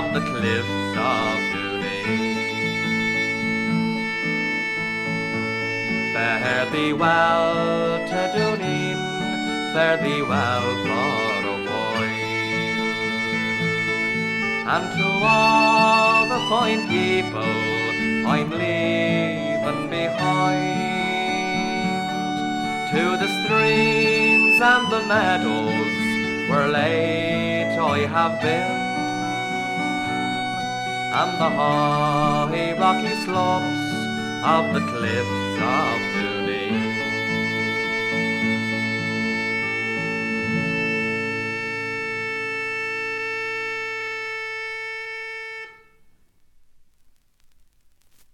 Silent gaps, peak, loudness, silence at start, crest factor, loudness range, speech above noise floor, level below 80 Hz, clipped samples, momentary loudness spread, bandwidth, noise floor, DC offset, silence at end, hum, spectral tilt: none; -4 dBFS; -21 LUFS; 0 s; 18 dB; 7 LU; 36 dB; -58 dBFS; under 0.1%; 8 LU; 14.5 kHz; -56 dBFS; under 0.1%; 2.6 s; none; -5 dB/octave